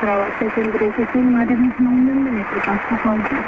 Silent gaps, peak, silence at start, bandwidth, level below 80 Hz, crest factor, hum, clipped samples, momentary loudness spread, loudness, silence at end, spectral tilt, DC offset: none; -6 dBFS; 0 s; 3.8 kHz; -46 dBFS; 12 dB; none; under 0.1%; 4 LU; -18 LUFS; 0 s; -8.5 dB/octave; under 0.1%